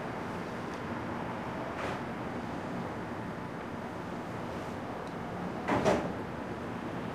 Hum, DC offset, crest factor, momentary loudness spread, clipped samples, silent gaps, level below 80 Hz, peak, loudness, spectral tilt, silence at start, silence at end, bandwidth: none; under 0.1%; 22 dB; 8 LU; under 0.1%; none; -56 dBFS; -14 dBFS; -36 LUFS; -6.5 dB/octave; 0 s; 0 s; 15.5 kHz